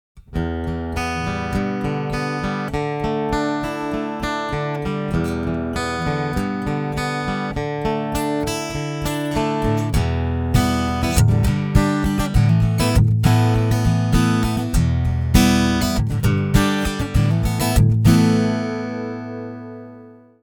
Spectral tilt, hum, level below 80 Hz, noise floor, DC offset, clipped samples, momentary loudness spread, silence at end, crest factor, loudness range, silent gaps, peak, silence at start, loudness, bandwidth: -6 dB/octave; none; -28 dBFS; -43 dBFS; under 0.1%; under 0.1%; 9 LU; 0.3 s; 18 dB; 6 LU; none; 0 dBFS; 0.15 s; -20 LUFS; 20 kHz